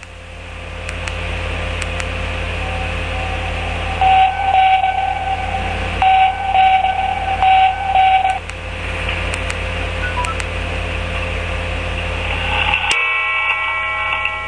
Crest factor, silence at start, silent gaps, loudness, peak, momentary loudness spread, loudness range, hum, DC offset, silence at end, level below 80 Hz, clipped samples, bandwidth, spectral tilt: 14 dB; 0 s; none; -17 LUFS; -2 dBFS; 10 LU; 7 LU; none; 0.4%; 0 s; -28 dBFS; under 0.1%; 10.5 kHz; -4 dB/octave